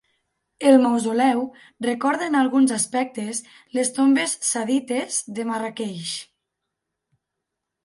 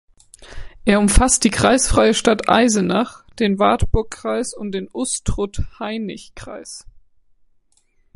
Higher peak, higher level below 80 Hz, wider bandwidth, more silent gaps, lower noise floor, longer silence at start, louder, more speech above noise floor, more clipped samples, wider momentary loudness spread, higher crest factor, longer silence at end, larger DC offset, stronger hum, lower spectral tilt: about the same, -4 dBFS vs -2 dBFS; second, -74 dBFS vs -28 dBFS; about the same, 11.5 kHz vs 11.5 kHz; neither; first, -82 dBFS vs -59 dBFS; first, 0.6 s vs 0.4 s; second, -22 LUFS vs -18 LUFS; first, 61 dB vs 42 dB; neither; second, 13 LU vs 18 LU; about the same, 18 dB vs 18 dB; first, 1.6 s vs 1.35 s; neither; neither; about the same, -3 dB/octave vs -4 dB/octave